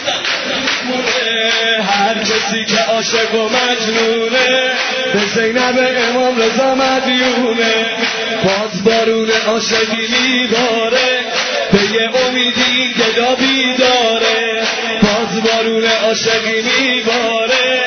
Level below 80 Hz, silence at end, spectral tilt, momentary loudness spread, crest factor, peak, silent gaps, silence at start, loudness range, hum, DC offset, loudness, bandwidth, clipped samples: -48 dBFS; 0 s; -2.5 dB/octave; 3 LU; 14 dB; 0 dBFS; none; 0 s; 1 LU; none; under 0.1%; -13 LUFS; 6.6 kHz; under 0.1%